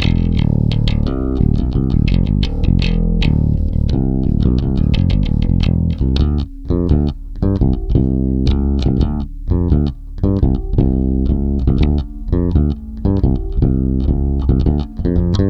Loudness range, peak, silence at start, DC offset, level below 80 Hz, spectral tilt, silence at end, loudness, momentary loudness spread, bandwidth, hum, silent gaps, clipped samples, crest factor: 1 LU; 0 dBFS; 0 s; under 0.1%; -18 dBFS; -9 dB/octave; 0 s; -17 LUFS; 4 LU; 6.2 kHz; none; none; under 0.1%; 14 dB